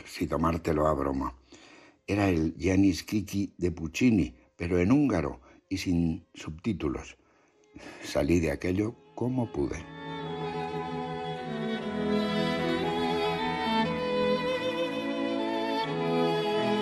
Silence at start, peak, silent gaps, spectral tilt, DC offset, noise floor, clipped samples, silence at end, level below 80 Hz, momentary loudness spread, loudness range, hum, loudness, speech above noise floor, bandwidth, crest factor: 0 s; -12 dBFS; none; -6 dB/octave; under 0.1%; -63 dBFS; under 0.1%; 0 s; -48 dBFS; 12 LU; 5 LU; none; -29 LUFS; 35 dB; 13 kHz; 16 dB